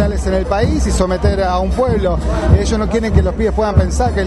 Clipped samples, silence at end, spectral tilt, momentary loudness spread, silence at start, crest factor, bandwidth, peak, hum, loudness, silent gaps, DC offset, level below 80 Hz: under 0.1%; 0 s; -6.5 dB/octave; 3 LU; 0 s; 14 dB; 11.5 kHz; 0 dBFS; none; -15 LUFS; none; under 0.1%; -18 dBFS